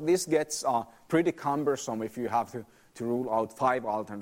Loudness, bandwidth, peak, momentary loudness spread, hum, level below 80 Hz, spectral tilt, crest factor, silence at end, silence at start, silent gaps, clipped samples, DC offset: -30 LUFS; 16 kHz; -12 dBFS; 7 LU; none; -68 dBFS; -5 dB/octave; 18 dB; 0 s; 0 s; none; under 0.1%; under 0.1%